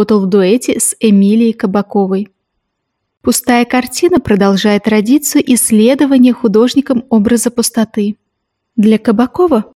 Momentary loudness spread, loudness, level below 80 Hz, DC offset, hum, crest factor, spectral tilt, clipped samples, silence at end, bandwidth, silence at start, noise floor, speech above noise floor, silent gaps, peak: 7 LU; -11 LUFS; -46 dBFS; under 0.1%; none; 10 dB; -5 dB/octave; under 0.1%; 0.15 s; 16.5 kHz; 0 s; -71 dBFS; 60 dB; none; 0 dBFS